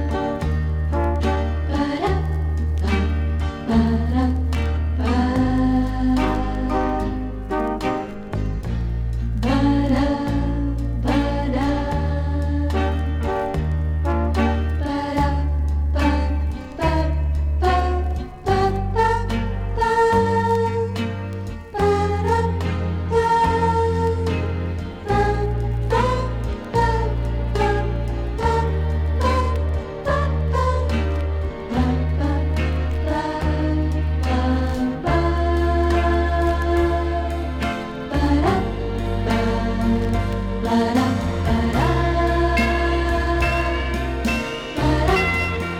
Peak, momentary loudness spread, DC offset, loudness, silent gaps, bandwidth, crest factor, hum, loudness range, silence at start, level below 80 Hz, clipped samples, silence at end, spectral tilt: -6 dBFS; 6 LU; under 0.1%; -21 LUFS; none; 11.5 kHz; 14 dB; none; 2 LU; 0 s; -26 dBFS; under 0.1%; 0 s; -7.5 dB/octave